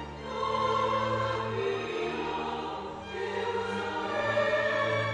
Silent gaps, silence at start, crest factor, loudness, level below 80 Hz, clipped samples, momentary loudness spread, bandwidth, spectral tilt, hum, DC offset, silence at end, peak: none; 0 s; 14 dB; -30 LUFS; -56 dBFS; under 0.1%; 9 LU; 10 kHz; -5 dB/octave; none; under 0.1%; 0 s; -16 dBFS